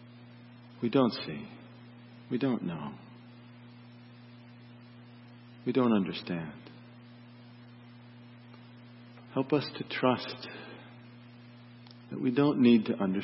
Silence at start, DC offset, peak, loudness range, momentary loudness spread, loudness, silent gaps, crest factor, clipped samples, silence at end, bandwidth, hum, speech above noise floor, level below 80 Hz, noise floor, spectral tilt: 0 s; under 0.1%; -12 dBFS; 8 LU; 25 LU; -30 LUFS; none; 22 dB; under 0.1%; 0 s; 5.8 kHz; 60 Hz at -55 dBFS; 23 dB; -74 dBFS; -52 dBFS; -10 dB/octave